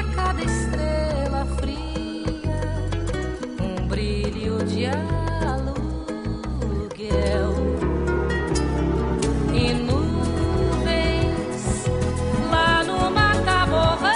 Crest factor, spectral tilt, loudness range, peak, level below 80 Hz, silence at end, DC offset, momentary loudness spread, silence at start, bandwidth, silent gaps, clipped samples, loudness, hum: 16 dB; -5.5 dB/octave; 5 LU; -6 dBFS; -28 dBFS; 0 s; 0.2%; 9 LU; 0 s; 10.5 kHz; none; under 0.1%; -23 LUFS; none